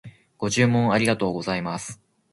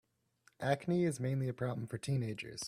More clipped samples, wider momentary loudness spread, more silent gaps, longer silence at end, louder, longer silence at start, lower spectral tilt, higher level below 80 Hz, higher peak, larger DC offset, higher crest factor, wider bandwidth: neither; first, 12 LU vs 7 LU; neither; first, 0.4 s vs 0 s; first, -23 LUFS vs -37 LUFS; second, 0.05 s vs 0.6 s; about the same, -5 dB/octave vs -6 dB/octave; first, -56 dBFS vs -70 dBFS; first, -6 dBFS vs -20 dBFS; neither; about the same, 18 dB vs 18 dB; second, 11.5 kHz vs 14 kHz